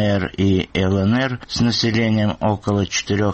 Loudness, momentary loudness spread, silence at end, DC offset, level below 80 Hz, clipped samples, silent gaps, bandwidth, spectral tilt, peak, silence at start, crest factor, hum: -19 LUFS; 3 LU; 0 s; under 0.1%; -44 dBFS; under 0.1%; none; 8.4 kHz; -5.5 dB/octave; -8 dBFS; 0 s; 10 dB; none